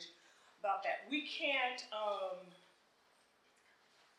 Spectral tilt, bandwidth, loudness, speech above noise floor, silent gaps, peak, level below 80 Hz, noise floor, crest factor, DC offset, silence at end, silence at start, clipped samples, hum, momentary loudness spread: -2 dB/octave; 12.5 kHz; -39 LUFS; 32 dB; none; -24 dBFS; under -90 dBFS; -72 dBFS; 18 dB; under 0.1%; 1.6 s; 0 s; under 0.1%; none; 15 LU